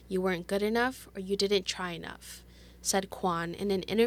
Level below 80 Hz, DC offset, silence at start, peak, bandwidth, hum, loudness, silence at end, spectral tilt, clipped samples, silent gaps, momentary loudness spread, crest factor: -56 dBFS; under 0.1%; 0 s; -14 dBFS; 19 kHz; 60 Hz at -55 dBFS; -31 LUFS; 0 s; -4 dB/octave; under 0.1%; none; 14 LU; 18 dB